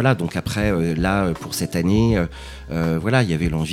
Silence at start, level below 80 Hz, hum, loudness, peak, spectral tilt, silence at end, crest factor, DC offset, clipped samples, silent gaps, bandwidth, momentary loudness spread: 0 s; -34 dBFS; none; -21 LUFS; -2 dBFS; -6 dB/octave; 0 s; 18 dB; under 0.1%; under 0.1%; none; 16.5 kHz; 7 LU